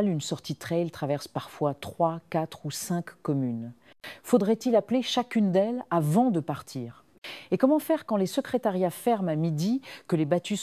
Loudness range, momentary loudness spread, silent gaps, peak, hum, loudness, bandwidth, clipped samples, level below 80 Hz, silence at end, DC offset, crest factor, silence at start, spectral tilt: 5 LU; 13 LU; 7.18-7.22 s; -8 dBFS; none; -28 LUFS; 16 kHz; under 0.1%; -68 dBFS; 0 s; under 0.1%; 20 dB; 0 s; -6 dB/octave